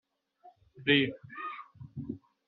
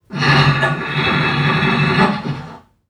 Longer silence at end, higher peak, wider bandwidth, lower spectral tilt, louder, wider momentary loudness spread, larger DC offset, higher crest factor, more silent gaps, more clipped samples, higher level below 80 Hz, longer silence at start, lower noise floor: about the same, 0.3 s vs 0.3 s; second, -12 dBFS vs -2 dBFS; second, 4.6 kHz vs 10 kHz; second, -3 dB/octave vs -6 dB/octave; second, -31 LUFS vs -15 LUFS; first, 19 LU vs 9 LU; neither; first, 24 dB vs 16 dB; neither; neither; second, -70 dBFS vs -42 dBFS; first, 0.45 s vs 0.1 s; first, -61 dBFS vs -36 dBFS